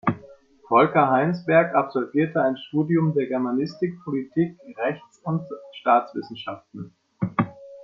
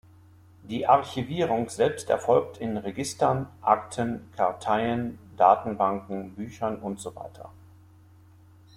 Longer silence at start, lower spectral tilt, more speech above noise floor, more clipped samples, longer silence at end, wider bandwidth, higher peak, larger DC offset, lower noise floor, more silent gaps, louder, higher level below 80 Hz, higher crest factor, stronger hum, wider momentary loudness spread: second, 0.05 s vs 0.65 s; first, -9 dB/octave vs -5.5 dB/octave; about the same, 27 dB vs 28 dB; neither; second, 0 s vs 1.25 s; second, 7 kHz vs 15 kHz; about the same, -4 dBFS vs -4 dBFS; neither; second, -49 dBFS vs -54 dBFS; neither; first, -23 LUFS vs -26 LUFS; about the same, -66 dBFS vs -62 dBFS; about the same, 20 dB vs 22 dB; neither; about the same, 16 LU vs 14 LU